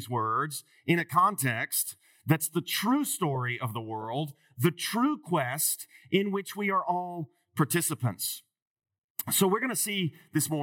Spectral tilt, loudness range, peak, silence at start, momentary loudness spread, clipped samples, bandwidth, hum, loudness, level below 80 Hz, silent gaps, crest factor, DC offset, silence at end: -4 dB/octave; 2 LU; -10 dBFS; 0 s; 10 LU; under 0.1%; 18 kHz; none; -29 LUFS; -86 dBFS; 8.62-8.76 s, 8.98-9.15 s; 20 dB; under 0.1%; 0 s